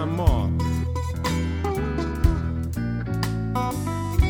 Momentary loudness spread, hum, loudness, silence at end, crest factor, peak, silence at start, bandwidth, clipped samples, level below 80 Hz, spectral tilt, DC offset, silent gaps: 5 LU; none; -25 LUFS; 0 s; 18 dB; -4 dBFS; 0 s; 20 kHz; under 0.1%; -28 dBFS; -7 dB/octave; under 0.1%; none